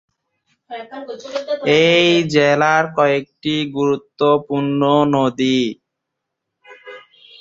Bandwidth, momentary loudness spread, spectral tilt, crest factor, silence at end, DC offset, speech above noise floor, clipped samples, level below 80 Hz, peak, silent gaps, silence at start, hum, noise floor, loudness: 7.8 kHz; 18 LU; -5.5 dB/octave; 18 dB; 0.4 s; under 0.1%; 62 dB; under 0.1%; -60 dBFS; 0 dBFS; none; 0.7 s; none; -79 dBFS; -16 LUFS